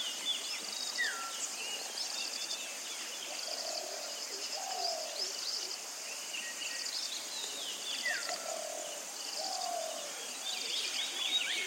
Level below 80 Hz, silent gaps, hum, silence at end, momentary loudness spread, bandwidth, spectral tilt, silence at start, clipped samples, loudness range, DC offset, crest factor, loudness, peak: under -90 dBFS; none; none; 0 s; 5 LU; 16.5 kHz; 2.5 dB/octave; 0 s; under 0.1%; 1 LU; under 0.1%; 18 dB; -36 LUFS; -20 dBFS